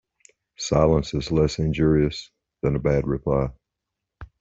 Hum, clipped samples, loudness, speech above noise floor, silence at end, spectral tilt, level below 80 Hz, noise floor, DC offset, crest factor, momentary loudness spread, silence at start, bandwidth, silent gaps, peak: none; under 0.1%; -23 LUFS; 62 dB; 0.15 s; -6.5 dB/octave; -38 dBFS; -84 dBFS; under 0.1%; 18 dB; 9 LU; 0.6 s; 7.8 kHz; none; -6 dBFS